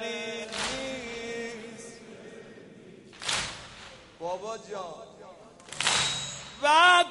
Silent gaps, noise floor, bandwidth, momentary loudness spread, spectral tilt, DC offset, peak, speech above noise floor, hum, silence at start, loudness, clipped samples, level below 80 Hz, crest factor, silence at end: none; -50 dBFS; 11.5 kHz; 24 LU; -1 dB/octave; under 0.1%; -8 dBFS; 26 dB; none; 0 s; -27 LUFS; under 0.1%; -60 dBFS; 22 dB; 0 s